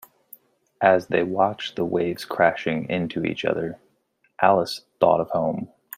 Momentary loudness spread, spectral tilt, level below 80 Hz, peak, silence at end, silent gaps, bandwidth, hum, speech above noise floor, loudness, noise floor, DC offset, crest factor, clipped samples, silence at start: 8 LU; -6 dB/octave; -64 dBFS; -2 dBFS; 0.3 s; none; 16 kHz; none; 45 dB; -23 LUFS; -67 dBFS; under 0.1%; 22 dB; under 0.1%; 0.8 s